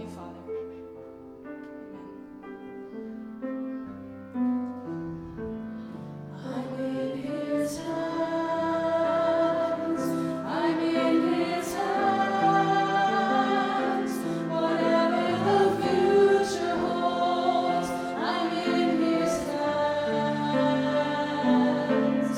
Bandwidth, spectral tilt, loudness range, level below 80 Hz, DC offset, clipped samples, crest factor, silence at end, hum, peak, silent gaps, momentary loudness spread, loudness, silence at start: 16.5 kHz; -5.5 dB/octave; 11 LU; -62 dBFS; under 0.1%; under 0.1%; 16 dB; 0 s; none; -10 dBFS; none; 17 LU; -26 LUFS; 0 s